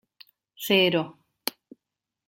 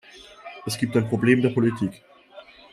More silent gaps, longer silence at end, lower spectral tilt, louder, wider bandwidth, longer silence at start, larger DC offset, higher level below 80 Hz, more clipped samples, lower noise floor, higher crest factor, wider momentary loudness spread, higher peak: neither; first, 0.8 s vs 0.3 s; second, -4 dB/octave vs -6.5 dB/octave; about the same, -25 LUFS vs -23 LUFS; first, 16.5 kHz vs 14 kHz; first, 0.6 s vs 0.15 s; neither; second, -72 dBFS vs -62 dBFS; neither; first, -86 dBFS vs -48 dBFS; about the same, 24 dB vs 20 dB; about the same, 16 LU vs 18 LU; about the same, -6 dBFS vs -4 dBFS